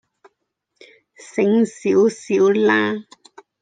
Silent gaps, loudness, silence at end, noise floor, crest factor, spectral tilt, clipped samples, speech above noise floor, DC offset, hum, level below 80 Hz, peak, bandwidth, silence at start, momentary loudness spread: none; -18 LUFS; 0.6 s; -74 dBFS; 16 dB; -5.5 dB/octave; under 0.1%; 57 dB; under 0.1%; none; -72 dBFS; -4 dBFS; 9.4 kHz; 1.35 s; 9 LU